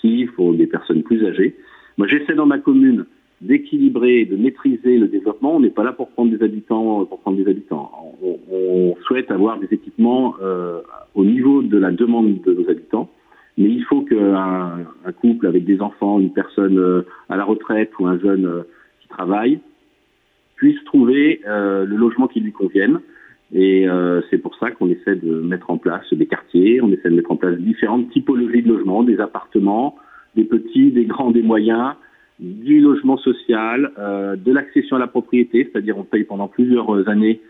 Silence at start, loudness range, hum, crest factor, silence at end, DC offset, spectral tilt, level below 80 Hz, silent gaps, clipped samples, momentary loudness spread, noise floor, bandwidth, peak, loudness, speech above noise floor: 0.05 s; 3 LU; none; 12 dB; 0.1 s; under 0.1%; -10 dB/octave; -64 dBFS; none; under 0.1%; 9 LU; -61 dBFS; 3.9 kHz; -4 dBFS; -17 LUFS; 45 dB